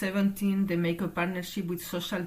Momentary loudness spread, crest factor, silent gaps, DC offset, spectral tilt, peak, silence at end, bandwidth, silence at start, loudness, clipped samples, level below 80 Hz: 6 LU; 14 dB; none; under 0.1%; -6 dB/octave; -16 dBFS; 0 s; 15.5 kHz; 0 s; -30 LUFS; under 0.1%; -58 dBFS